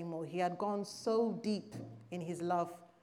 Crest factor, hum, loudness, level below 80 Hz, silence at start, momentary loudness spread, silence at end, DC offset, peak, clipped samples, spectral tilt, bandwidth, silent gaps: 16 dB; none; -38 LUFS; -84 dBFS; 0 s; 11 LU; 0.15 s; under 0.1%; -22 dBFS; under 0.1%; -6 dB/octave; 14 kHz; none